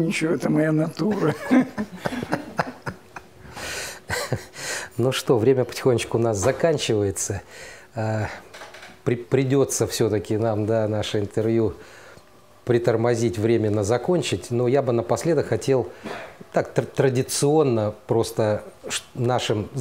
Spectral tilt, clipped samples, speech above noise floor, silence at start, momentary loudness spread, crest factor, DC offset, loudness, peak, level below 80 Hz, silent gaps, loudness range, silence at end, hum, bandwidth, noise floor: -5.5 dB/octave; under 0.1%; 29 dB; 0 s; 13 LU; 18 dB; 0.2%; -23 LUFS; -4 dBFS; -54 dBFS; none; 4 LU; 0 s; none; 16 kHz; -51 dBFS